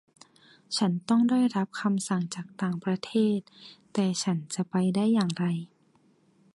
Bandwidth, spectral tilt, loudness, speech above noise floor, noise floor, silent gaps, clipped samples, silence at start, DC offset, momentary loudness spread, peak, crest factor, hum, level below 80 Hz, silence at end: 11.5 kHz; -5.5 dB/octave; -28 LUFS; 37 dB; -64 dBFS; none; under 0.1%; 0.7 s; under 0.1%; 9 LU; -12 dBFS; 16 dB; none; -72 dBFS; 0.9 s